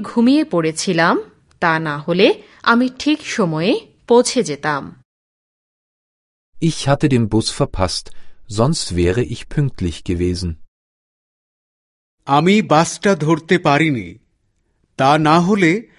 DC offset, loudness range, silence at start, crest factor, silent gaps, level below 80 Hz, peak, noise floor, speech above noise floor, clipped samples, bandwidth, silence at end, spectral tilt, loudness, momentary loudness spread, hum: under 0.1%; 5 LU; 0 s; 18 dB; 5.05-6.53 s, 10.68-12.18 s; -38 dBFS; 0 dBFS; -64 dBFS; 48 dB; under 0.1%; 11.5 kHz; 0.15 s; -5.5 dB/octave; -17 LUFS; 9 LU; none